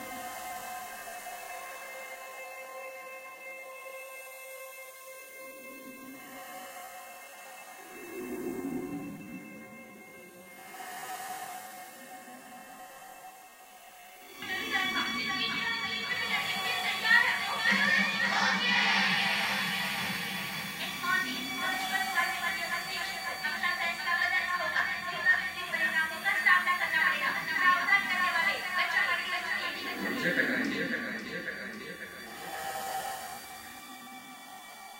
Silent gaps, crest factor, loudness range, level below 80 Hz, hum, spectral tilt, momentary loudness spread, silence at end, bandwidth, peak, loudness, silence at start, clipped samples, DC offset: none; 22 dB; 17 LU; -70 dBFS; none; -2 dB/octave; 21 LU; 0 s; 16 kHz; -12 dBFS; -29 LUFS; 0 s; under 0.1%; under 0.1%